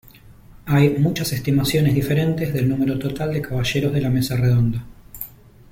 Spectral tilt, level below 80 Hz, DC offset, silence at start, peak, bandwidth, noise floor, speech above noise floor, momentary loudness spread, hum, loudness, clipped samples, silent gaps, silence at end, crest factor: -6.5 dB/octave; -42 dBFS; under 0.1%; 0.3 s; -4 dBFS; 16.5 kHz; -45 dBFS; 26 dB; 17 LU; none; -20 LUFS; under 0.1%; none; 0.4 s; 16 dB